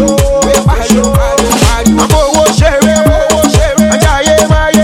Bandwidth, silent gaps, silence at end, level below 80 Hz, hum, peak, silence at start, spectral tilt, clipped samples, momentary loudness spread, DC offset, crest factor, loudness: 17.5 kHz; none; 0 s; -16 dBFS; none; 0 dBFS; 0 s; -4.5 dB/octave; 0.4%; 2 LU; under 0.1%; 8 dB; -8 LUFS